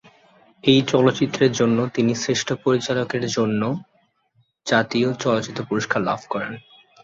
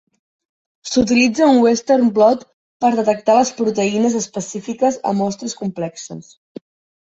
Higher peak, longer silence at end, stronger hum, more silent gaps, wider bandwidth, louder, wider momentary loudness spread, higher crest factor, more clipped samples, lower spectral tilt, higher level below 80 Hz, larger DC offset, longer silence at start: about the same, -2 dBFS vs -2 dBFS; second, 0.45 s vs 0.8 s; neither; second, none vs 2.53-2.80 s; about the same, 8 kHz vs 8 kHz; second, -21 LUFS vs -17 LUFS; second, 9 LU vs 14 LU; about the same, 20 dB vs 16 dB; neither; about the same, -5 dB/octave vs -4.5 dB/octave; second, -60 dBFS vs -54 dBFS; neither; second, 0.65 s vs 0.85 s